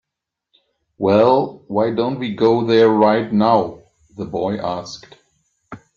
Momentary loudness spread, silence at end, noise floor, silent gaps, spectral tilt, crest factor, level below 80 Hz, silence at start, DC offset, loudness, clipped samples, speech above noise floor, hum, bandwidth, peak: 15 LU; 0.2 s; -82 dBFS; none; -7 dB/octave; 16 dB; -58 dBFS; 1 s; under 0.1%; -17 LUFS; under 0.1%; 66 dB; none; 7.2 kHz; -2 dBFS